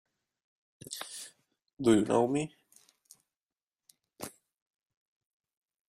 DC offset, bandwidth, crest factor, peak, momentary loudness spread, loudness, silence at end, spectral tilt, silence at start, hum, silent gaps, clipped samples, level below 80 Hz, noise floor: under 0.1%; 15.5 kHz; 24 dB; -12 dBFS; 20 LU; -30 LUFS; 1.6 s; -5.5 dB/octave; 0.9 s; none; 1.73-1.77 s, 3.37-3.41 s, 3.63-3.67 s; under 0.1%; -72 dBFS; under -90 dBFS